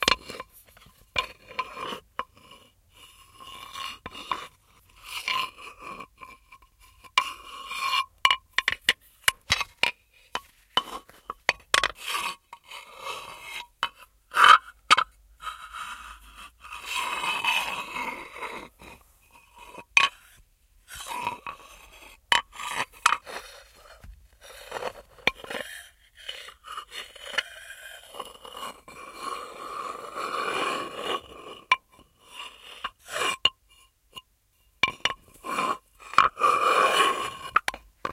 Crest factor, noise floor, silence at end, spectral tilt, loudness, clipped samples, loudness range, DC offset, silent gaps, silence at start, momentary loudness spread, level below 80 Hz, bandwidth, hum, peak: 30 dB; -66 dBFS; 0 s; -0.5 dB/octave; -26 LUFS; under 0.1%; 13 LU; under 0.1%; none; 0 s; 22 LU; -58 dBFS; 16 kHz; none; 0 dBFS